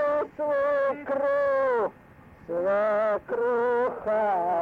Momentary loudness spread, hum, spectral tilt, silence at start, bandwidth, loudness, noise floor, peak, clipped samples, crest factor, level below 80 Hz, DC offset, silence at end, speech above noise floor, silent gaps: 4 LU; none; -7 dB/octave; 0 s; 5.4 kHz; -26 LUFS; -51 dBFS; -18 dBFS; under 0.1%; 8 dB; -62 dBFS; under 0.1%; 0 s; 26 dB; none